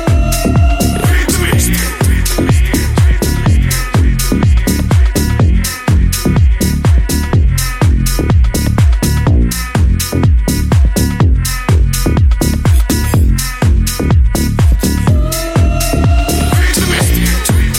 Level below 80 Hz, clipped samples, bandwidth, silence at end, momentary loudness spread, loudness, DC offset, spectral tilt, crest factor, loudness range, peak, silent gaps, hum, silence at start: -12 dBFS; under 0.1%; 17 kHz; 0 s; 2 LU; -12 LUFS; under 0.1%; -5 dB/octave; 10 dB; 0 LU; 0 dBFS; none; none; 0 s